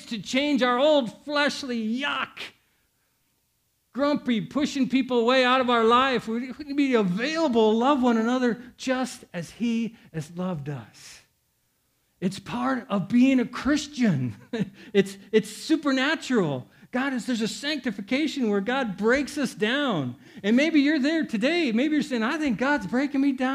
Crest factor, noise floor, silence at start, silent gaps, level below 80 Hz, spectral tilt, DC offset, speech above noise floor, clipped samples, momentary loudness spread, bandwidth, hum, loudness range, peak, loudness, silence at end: 18 dB; -71 dBFS; 0 s; none; -60 dBFS; -5 dB/octave; under 0.1%; 47 dB; under 0.1%; 11 LU; 13.5 kHz; none; 7 LU; -8 dBFS; -25 LUFS; 0 s